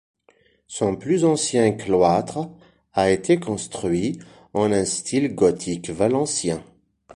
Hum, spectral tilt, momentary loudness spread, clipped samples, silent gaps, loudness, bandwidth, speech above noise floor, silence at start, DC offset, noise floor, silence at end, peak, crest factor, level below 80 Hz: none; -5 dB/octave; 11 LU; under 0.1%; none; -22 LUFS; 11.5 kHz; 39 dB; 0.7 s; under 0.1%; -60 dBFS; 0.5 s; -4 dBFS; 18 dB; -52 dBFS